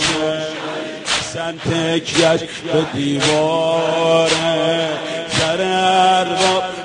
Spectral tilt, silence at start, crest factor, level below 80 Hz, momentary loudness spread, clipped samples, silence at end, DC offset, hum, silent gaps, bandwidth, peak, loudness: -3.5 dB/octave; 0 s; 16 dB; -50 dBFS; 9 LU; under 0.1%; 0 s; under 0.1%; none; none; 10.5 kHz; -2 dBFS; -17 LUFS